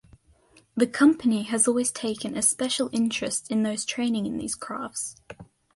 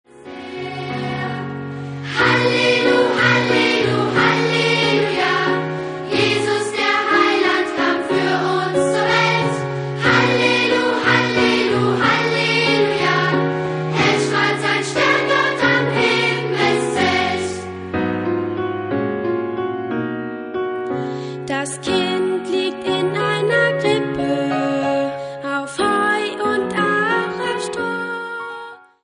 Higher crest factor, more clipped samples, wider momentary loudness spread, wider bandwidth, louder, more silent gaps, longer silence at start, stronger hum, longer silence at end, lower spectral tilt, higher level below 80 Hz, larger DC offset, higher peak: about the same, 18 dB vs 18 dB; neither; about the same, 12 LU vs 10 LU; first, 12 kHz vs 10.5 kHz; second, -25 LUFS vs -18 LUFS; neither; first, 0.75 s vs 0.15 s; neither; about the same, 0.3 s vs 0.25 s; second, -3 dB/octave vs -4.5 dB/octave; second, -62 dBFS vs -52 dBFS; neither; second, -8 dBFS vs -2 dBFS